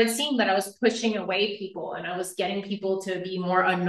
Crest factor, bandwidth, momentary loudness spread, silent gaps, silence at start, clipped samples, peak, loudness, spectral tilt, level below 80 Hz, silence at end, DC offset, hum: 18 dB; 12.5 kHz; 9 LU; none; 0 s; under 0.1%; -8 dBFS; -27 LUFS; -4 dB/octave; -74 dBFS; 0 s; under 0.1%; none